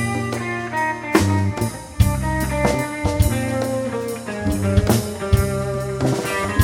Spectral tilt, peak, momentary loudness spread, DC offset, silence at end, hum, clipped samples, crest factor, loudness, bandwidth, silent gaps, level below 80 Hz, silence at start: -6 dB/octave; 0 dBFS; 7 LU; under 0.1%; 0 s; none; under 0.1%; 20 dB; -21 LUFS; 17 kHz; none; -30 dBFS; 0 s